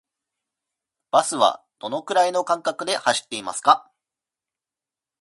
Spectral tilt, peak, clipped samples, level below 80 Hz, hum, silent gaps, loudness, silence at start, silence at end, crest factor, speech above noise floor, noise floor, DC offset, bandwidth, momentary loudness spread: -1.5 dB/octave; -2 dBFS; under 0.1%; -76 dBFS; none; none; -22 LUFS; 1.15 s; 1.4 s; 24 dB; 69 dB; -90 dBFS; under 0.1%; 11.5 kHz; 10 LU